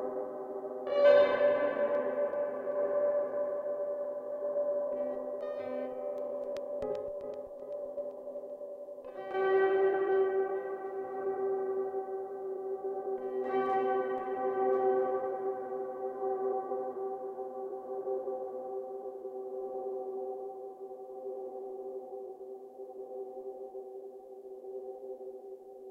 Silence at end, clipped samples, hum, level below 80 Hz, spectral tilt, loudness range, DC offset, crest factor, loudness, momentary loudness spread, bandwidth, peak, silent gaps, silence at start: 0 s; under 0.1%; none; -76 dBFS; -6.5 dB/octave; 13 LU; under 0.1%; 20 dB; -34 LUFS; 16 LU; 5 kHz; -12 dBFS; none; 0 s